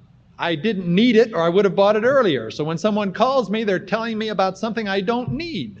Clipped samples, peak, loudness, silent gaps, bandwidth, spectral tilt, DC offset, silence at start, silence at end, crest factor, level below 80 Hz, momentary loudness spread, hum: under 0.1%; -2 dBFS; -20 LUFS; none; 8 kHz; -6.5 dB/octave; under 0.1%; 0.4 s; 0 s; 18 dB; -54 dBFS; 9 LU; none